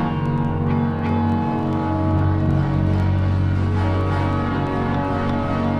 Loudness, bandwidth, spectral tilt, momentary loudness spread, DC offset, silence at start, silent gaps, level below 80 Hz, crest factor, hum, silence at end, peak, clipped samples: -21 LUFS; 6 kHz; -9 dB/octave; 2 LU; under 0.1%; 0 s; none; -36 dBFS; 14 dB; none; 0 s; -6 dBFS; under 0.1%